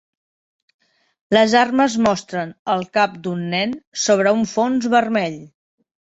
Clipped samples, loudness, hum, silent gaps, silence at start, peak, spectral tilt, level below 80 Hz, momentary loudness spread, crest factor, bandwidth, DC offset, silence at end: under 0.1%; -18 LUFS; none; 2.59-2.65 s, 3.87-3.92 s; 1.3 s; -2 dBFS; -4.5 dB/octave; -60 dBFS; 11 LU; 18 dB; 8.2 kHz; under 0.1%; 0.55 s